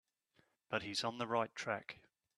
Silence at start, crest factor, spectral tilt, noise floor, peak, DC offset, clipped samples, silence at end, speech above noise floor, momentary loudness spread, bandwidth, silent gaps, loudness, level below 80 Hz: 0.7 s; 22 dB; -3.5 dB/octave; -77 dBFS; -20 dBFS; under 0.1%; under 0.1%; 0.45 s; 36 dB; 10 LU; 13 kHz; none; -40 LUFS; -80 dBFS